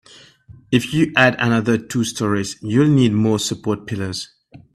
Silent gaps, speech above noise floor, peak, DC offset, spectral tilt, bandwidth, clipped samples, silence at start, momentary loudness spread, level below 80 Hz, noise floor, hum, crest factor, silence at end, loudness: none; 28 dB; 0 dBFS; under 0.1%; -5.5 dB/octave; 14.5 kHz; under 0.1%; 0.5 s; 11 LU; -52 dBFS; -46 dBFS; none; 18 dB; 0.15 s; -18 LUFS